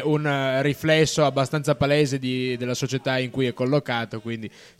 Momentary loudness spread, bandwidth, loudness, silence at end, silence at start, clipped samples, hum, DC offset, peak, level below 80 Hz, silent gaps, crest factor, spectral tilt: 8 LU; 15.5 kHz; -23 LUFS; 0.3 s; 0 s; under 0.1%; none; under 0.1%; -8 dBFS; -56 dBFS; none; 16 dB; -5.5 dB/octave